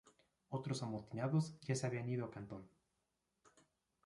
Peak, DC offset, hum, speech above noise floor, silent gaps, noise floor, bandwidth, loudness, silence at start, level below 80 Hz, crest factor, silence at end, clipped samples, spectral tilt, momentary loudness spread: -26 dBFS; under 0.1%; none; 45 dB; none; -87 dBFS; 11.5 kHz; -42 LUFS; 0.5 s; -76 dBFS; 18 dB; 1.4 s; under 0.1%; -6.5 dB/octave; 12 LU